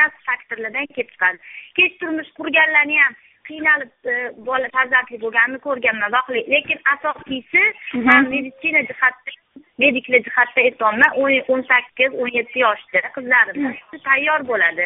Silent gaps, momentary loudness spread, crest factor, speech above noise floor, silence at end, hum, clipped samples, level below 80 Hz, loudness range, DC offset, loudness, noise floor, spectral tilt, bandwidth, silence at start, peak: none; 11 LU; 18 dB; 24 dB; 0 s; none; under 0.1%; -62 dBFS; 2 LU; under 0.1%; -17 LUFS; -42 dBFS; 0 dB/octave; 4 kHz; 0 s; 0 dBFS